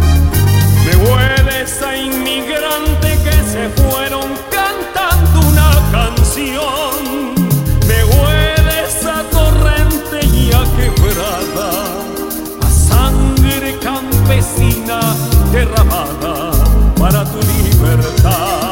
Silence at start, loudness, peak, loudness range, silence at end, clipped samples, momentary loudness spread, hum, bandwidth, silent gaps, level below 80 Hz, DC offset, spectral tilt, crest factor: 0 s; -13 LUFS; 0 dBFS; 2 LU; 0 s; under 0.1%; 7 LU; none; 17 kHz; none; -14 dBFS; under 0.1%; -5 dB/octave; 12 dB